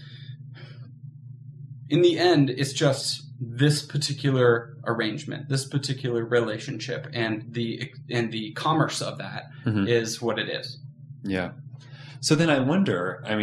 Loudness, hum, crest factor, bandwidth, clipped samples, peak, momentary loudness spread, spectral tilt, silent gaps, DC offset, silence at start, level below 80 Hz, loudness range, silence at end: -25 LUFS; none; 20 dB; 13.5 kHz; under 0.1%; -6 dBFS; 22 LU; -5.5 dB/octave; none; under 0.1%; 0 s; -68 dBFS; 5 LU; 0 s